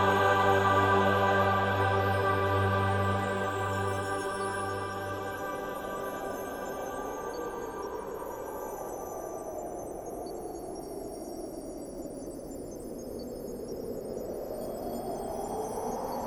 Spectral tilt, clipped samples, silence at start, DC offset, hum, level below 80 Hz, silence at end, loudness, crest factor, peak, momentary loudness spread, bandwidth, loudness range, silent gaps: -5.5 dB/octave; under 0.1%; 0 s; under 0.1%; none; -56 dBFS; 0 s; -32 LUFS; 20 dB; -12 dBFS; 15 LU; 16.5 kHz; 13 LU; none